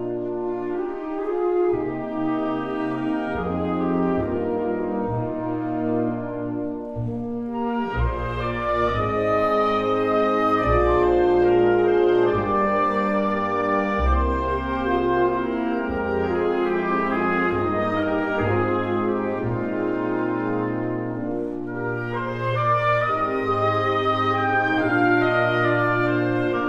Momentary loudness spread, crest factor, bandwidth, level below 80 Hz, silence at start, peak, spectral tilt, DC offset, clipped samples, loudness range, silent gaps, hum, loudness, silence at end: 8 LU; 14 dB; 6.8 kHz; -38 dBFS; 0 s; -8 dBFS; -8.5 dB/octave; under 0.1%; under 0.1%; 6 LU; none; none; -22 LUFS; 0 s